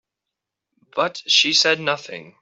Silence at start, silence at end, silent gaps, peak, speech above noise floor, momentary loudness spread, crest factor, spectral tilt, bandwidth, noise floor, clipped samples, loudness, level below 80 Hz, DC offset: 0.95 s; 0.2 s; none; -4 dBFS; 63 dB; 15 LU; 20 dB; -1 dB/octave; 8.2 kHz; -84 dBFS; under 0.1%; -18 LUFS; -72 dBFS; under 0.1%